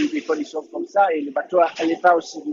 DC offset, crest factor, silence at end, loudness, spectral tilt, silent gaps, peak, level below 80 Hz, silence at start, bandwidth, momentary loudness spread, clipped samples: under 0.1%; 18 dB; 0 s; -21 LUFS; -4 dB/octave; none; -2 dBFS; -74 dBFS; 0 s; 7.6 kHz; 8 LU; under 0.1%